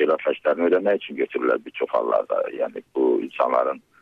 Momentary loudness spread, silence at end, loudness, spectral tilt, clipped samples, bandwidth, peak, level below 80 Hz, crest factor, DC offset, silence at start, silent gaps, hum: 7 LU; 0.25 s; -23 LUFS; -7 dB/octave; under 0.1%; 5.2 kHz; -8 dBFS; -72 dBFS; 14 dB; under 0.1%; 0 s; none; none